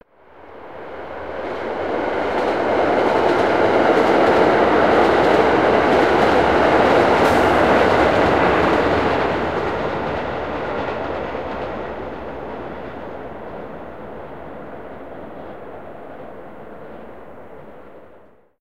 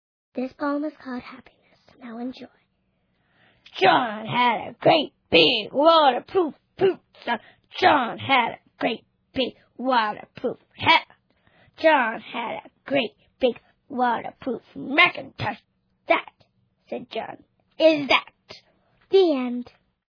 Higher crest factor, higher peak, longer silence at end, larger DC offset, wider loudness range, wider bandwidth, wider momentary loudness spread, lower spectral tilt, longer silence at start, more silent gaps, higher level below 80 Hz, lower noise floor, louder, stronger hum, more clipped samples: about the same, 18 dB vs 22 dB; about the same, 0 dBFS vs -2 dBFS; second, 0 s vs 0.5 s; first, 0.9% vs under 0.1%; first, 21 LU vs 6 LU; first, 15 kHz vs 5.4 kHz; first, 21 LU vs 18 LU; about the same, -6 dB/octave vs -5.5 dB/octave; second, 0 s vs 0.35 s; neither; first, -42 dBFS vs -64 dBFS; second, -49 dBFS vs -70 dBFS; first, -17 LUFS vs -22 LUFS; neither; neither